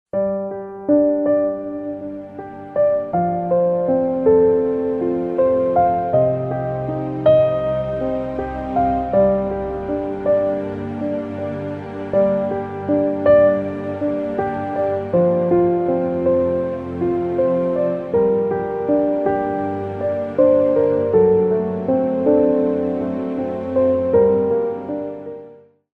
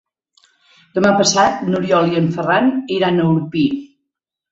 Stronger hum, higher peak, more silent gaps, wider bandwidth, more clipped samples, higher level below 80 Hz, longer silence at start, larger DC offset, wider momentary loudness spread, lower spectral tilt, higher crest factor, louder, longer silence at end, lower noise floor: neither; about the same, -4 dBFS vs -2 dBFS; neither; second, 4.7 kHz vs 8 kHz; neither; first, -46 dBFS vs -56 dBFS; second, 0.15 s vs 0.95 s; neither; first, 11 LU vs 7 LU; first, -10.5 dB/octave vs -5 dB/octave; about the same, 14 dB vs 16 dB; second, -19 LUFS vs -16 LUFS; second, 0.45 s vs 0.65 s; second, -43 dBFS vs -79 dBFS